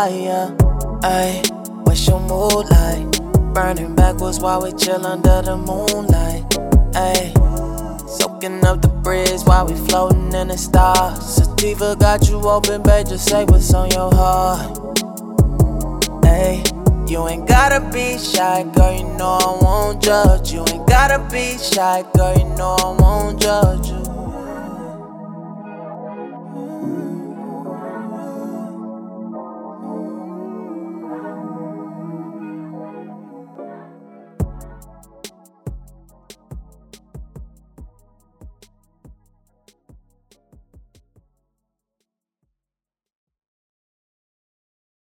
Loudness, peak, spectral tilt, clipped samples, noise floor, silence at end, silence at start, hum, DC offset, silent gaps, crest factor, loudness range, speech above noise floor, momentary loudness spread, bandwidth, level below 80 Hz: -16 LUFS; 0 dBFS; -5 dB/octave; under 0.1%; -89 dBFS; 6.55 s; 0 s; none; under 0.1%; none; 16 dB; 16 LU; 75 dB; 18 LU; 18.5 kHz; -22 dBFS